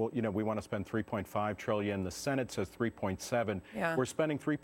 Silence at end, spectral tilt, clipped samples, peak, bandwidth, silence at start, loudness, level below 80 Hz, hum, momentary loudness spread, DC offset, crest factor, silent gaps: 0.05 s; -5.5 dB/octave; under 0.1%; -16 dBFS; 17 kHz; 0 s; -35 LUFS; -62 dBFS; none; 4 LU; under 0.1%; 18 dB; none